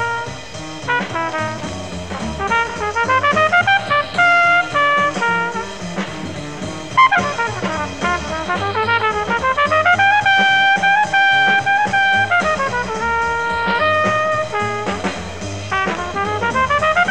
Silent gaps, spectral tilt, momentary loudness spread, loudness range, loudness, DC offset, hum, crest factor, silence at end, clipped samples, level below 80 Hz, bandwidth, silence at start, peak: none; -3.5 dB/octave; 14 LU; 5 LU; -16 LUFS; 0.9%; none; 16 dB; 0 s; under 0.1%; -42 dBFS; 10.5 kHz; 0 s; -2 dBFS